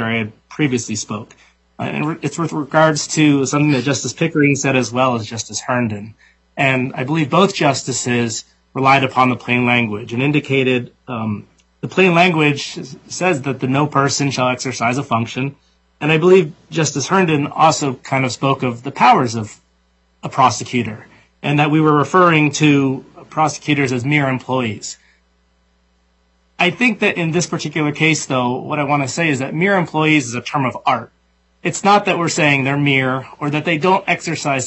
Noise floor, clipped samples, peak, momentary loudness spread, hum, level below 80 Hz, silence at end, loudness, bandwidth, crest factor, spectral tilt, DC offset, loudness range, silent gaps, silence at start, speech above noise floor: -59 dBFS; under 0.1%; 0 dBFS; 11 LU; none; -60 dBFS; 0 s; -16 LUFS; 8.4 kHz; 16 dB; -5 dB/octave; under 0.1%; 3 LU; none; 0 s; 43 dB